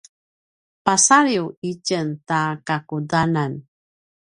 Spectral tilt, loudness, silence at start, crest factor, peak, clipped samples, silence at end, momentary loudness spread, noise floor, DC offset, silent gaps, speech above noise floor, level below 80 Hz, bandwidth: -3.5 dB/octave; -20 LUFS; 0.85 s; 22 dB; 0 dBFS; under 0.1%; 0.7 s; 13 LU; under -90 dBFS; under 0.1%; 1.57-1.62 s; over 70 dB; -58 dBFS; 11.5 kHz